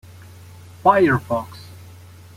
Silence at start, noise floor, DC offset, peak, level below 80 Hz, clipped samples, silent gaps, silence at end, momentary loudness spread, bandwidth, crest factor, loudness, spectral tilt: 0.85 s; -42 dBFS; under 0.1%; -2 dBFS; -54 dBFS; under 0.1%; none; 0.6 s; 25 LU; 16 kHz; 20 dB; -18 LUFS; -7.5 dB/octave